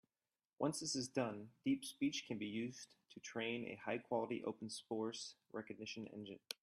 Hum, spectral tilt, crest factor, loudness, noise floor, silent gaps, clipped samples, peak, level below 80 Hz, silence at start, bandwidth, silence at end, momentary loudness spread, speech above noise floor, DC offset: none; -4 dB/octave; 22 dB; -44 LUFS; under -90 dBFS; none; under 0.1%; -22 dBFS; -84 dBFS; 0.6 s; 14 kHz; 0.1 s; 10 LU; over 45 dB; under 0.1%